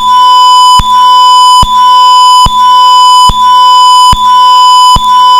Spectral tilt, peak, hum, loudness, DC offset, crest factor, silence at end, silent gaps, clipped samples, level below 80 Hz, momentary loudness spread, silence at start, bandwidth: -1 dB/octave; 0 dBFS; none; -2 LUFS; under 0.1%; 2 dB; 0 s; none; 0.6%; -22 dBFS; 2 LU; 0 s; 16 kHz